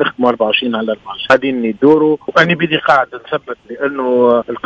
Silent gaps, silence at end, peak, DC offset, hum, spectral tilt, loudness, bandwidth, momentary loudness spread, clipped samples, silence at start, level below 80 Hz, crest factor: none; 0.05 s; 0 dBFS; under 0.1%; none; -6 dB/octave; -14 LUFS; 8 kHz; 10 LU; 0.4%; 0 s; -54 dBFS; 14 dB